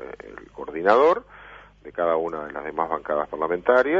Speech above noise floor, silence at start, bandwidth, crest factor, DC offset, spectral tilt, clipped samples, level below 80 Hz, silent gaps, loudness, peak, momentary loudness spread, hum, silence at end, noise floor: 24 dB; 0 s; 7.4 kHz; 20 dB; under 0.1%; -6.5 dB/octave; under 0.1%; -56 dBFS; none; -23 LUFS; -4 dBFS; 22 LU; 50 Hz at -55 dBFS; 0 s; -46 dBFS